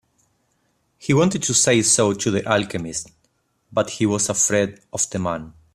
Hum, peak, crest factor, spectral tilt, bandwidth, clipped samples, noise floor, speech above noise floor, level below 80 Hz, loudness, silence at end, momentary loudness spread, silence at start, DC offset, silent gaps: none; -2 dBFS; 20 dB; -3.5 dB/octave; 15 kHz; under 0.1%; -67 dBFS; 47 dB; -54 dBFS; -20 LUFS; 0.25 s; 13 LU; 1 s; under 0.1%; none